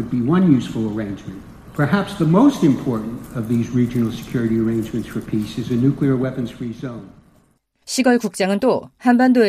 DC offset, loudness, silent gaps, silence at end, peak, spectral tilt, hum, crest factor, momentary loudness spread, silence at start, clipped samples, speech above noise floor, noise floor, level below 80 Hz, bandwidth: under 0.1%; -19 LUFS; none; 0 s; -2 dBFS; -6.5 dB/octave; none; 18 dB; 14 LU; 0 s; under 0.1%; 41 dB; -59 dBFS; -46 dBFS; 15 kHz